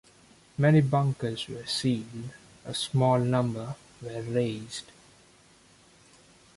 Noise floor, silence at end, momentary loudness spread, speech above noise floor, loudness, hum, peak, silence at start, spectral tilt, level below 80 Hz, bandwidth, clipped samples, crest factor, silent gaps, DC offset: -58 dBFS; 1.75 s; 18 LU; 31 dB; -27 LUFS; none; -12 dBFS; 0.6 s; -6 dB/octave; -62 dBFS; 11.5 kHz; under 0.1%; 18 dB; none; under 0.1%